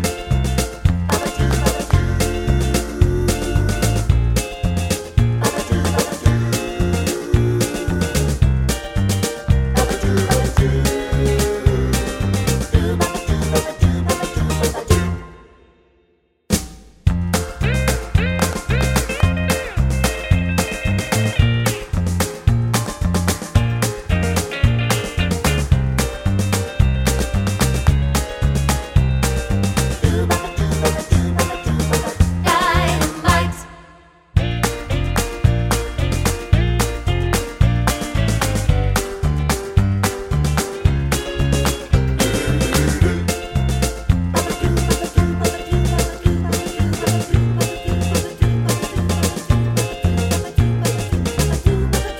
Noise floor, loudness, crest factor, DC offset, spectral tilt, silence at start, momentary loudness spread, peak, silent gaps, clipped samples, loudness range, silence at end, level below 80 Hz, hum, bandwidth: -60 dBFS; -19 LUFS; 16 dB; under 0.1%; -5 dB/octave; 0 s; 4 LU; 0 dBFS; none; under 0.1%; 2 LU; 0 s; -24 dBFS; none; 16.5 kHz